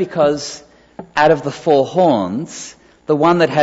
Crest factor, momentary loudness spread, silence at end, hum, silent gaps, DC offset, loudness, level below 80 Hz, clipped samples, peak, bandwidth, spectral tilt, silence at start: 14 dB; 18 LU; 0 s; none; none; under 0.1%; -15 LUFS; -54 dBFS; under 0.1%; -2 dBFS; 8 kHz; -5.5 dB/octave; 0 s